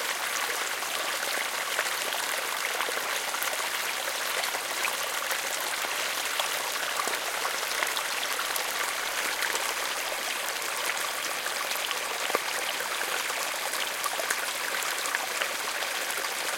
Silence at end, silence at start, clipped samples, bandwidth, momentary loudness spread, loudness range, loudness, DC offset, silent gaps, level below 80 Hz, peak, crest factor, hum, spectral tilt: 0 s; 0 s; under 0.1%; 17 kHz; 2 LU; 1 LU; -28 LUFS; under 0.1%; none; -72 dBFS; -8 dBFS; 22 dB; none; 1.5 dB/octave